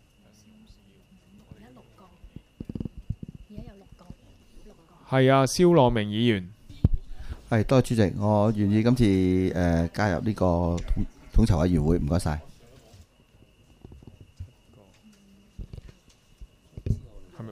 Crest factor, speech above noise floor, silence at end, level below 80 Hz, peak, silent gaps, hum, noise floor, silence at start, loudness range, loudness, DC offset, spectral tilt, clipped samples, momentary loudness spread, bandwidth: 22 dB; 36 dB; 0 s; -36 dBFS; -4 dBFS; none; none; -58 dBFS; 2.25 s; 19 LU; -24 LUFS; under 0.1%; -7 dB/octave; under 0.1%; 24 LU; 15 kHz